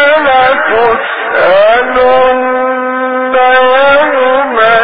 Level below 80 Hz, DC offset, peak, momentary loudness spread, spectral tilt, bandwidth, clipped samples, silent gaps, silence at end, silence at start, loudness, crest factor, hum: -42 dBFS; under 0.1%; 0 dBFS; 6 LU; -6.5 dB/octave; 5 kHz; 0.1%; none; 0 s; 0 s; -8 LUFS; 8 dB; none